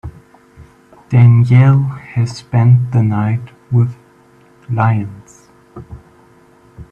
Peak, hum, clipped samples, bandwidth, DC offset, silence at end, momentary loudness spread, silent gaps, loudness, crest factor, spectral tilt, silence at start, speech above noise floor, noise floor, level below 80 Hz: 0 dBFS; none; under 0.1%; 7 kHz; under 0.1%; 0.1 s; 14 LU; none; -13 LUFS; 14 dB; -9 dB/octave; 0.05 s; 35 dB; -47 dBFS; -46 dBFS